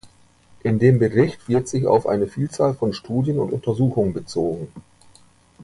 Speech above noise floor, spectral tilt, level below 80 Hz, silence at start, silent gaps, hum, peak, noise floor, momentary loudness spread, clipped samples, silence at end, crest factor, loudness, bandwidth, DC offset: 34 dB; -7.5 dB/octave; -50 dBFS; 0.05 s; none; 60 Hz at -45 dBFS; -2 dBFS; -53 dBFS; 8 LU; under 0.1%; 0 s; 18 dB; -21 LUFS; 11.5 kHz; under 0.1%